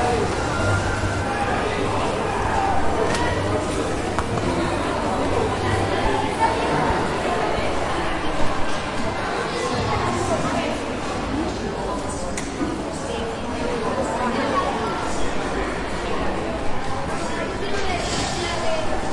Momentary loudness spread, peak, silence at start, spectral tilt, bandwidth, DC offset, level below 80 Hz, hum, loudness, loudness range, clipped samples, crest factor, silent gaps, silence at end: 5 LU; -4 dBFS; 0 s; -5 dB/octave; 11.5 kHz; under 0.1%; -36 dBFS; none; -23 LUFS; 4 LU; under 0.1%; 18 dB; none; 0 s